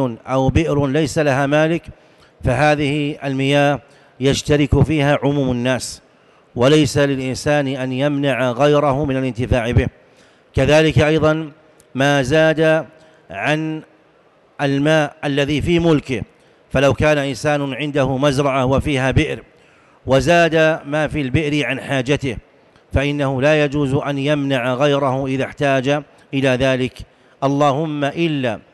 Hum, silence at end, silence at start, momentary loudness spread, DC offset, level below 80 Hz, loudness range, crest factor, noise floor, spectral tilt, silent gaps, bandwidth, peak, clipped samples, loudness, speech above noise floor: none; 0.15 s; 0 s; 9 LU; under 0.1%; -36 dBFS; 2 LU; 12 dB; -53 dBFS; -6 dB/octave; none; 12.5 kHz; -6 dBFS; under 0.1%; -17 LUFS; 36 dB